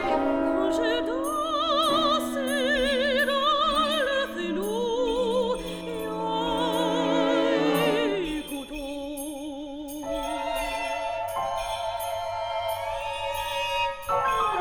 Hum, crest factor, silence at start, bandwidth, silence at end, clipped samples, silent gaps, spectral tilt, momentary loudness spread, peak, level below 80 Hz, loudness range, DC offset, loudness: none; 14 dB; 0 s; 19.5 kHz; 0 s; under 0.1%; none; -3.5 dB/octave; 10 LU; -12 dBFS; -48 dBFS; 7 LU; under 0.1%; -26 LUFS